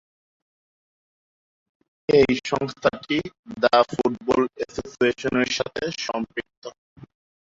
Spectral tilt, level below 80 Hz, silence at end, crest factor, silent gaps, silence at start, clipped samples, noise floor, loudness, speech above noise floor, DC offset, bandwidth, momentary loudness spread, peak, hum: -4.5 dB/octave; -56 dBFS; 0.85 s; 20 dB; 3.39-3.43 s, 6.57-6.62 s; 2.1 s; under 0.1%; under -90 dBFS; -23 LUFS; over 67 dB; under 0.1%; 7.8 kHz; 15 LU; -4 dBFS; none